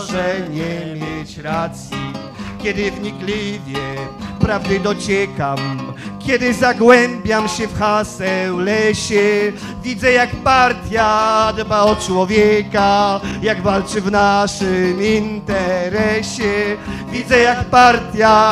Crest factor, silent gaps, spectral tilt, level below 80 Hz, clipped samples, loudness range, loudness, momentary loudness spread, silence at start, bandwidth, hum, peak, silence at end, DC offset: 16 dB; none; -5 dB/octave; -38 dBFS; under 0.1%; 8 LU; -16 LUFS; 13 LU; 0 s; 14 kHz; none; 0 dBFS; 0 s; under 0.1%